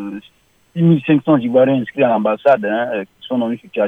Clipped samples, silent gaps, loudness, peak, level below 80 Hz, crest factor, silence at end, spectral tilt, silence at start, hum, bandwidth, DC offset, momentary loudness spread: under 0.1%; none; -16 LUFS; -2 dBFS; -62 dBFS; 14 dB; 0 s; -9.5 dB/octave; 0 s; none; 3.9 kHz; under 0.1%; 11 LU